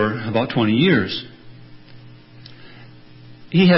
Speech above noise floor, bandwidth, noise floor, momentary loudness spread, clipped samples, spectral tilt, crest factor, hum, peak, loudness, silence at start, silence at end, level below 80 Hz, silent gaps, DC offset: 27 dB; 5.8 kHz; -42 dBFS; 25 LU; under 0.1%; -11 dB/octave; 18 dB; none; -2 dBFS; -19 LUFS; 0 s; 0 s; -54 dBFS; none; under 0.1%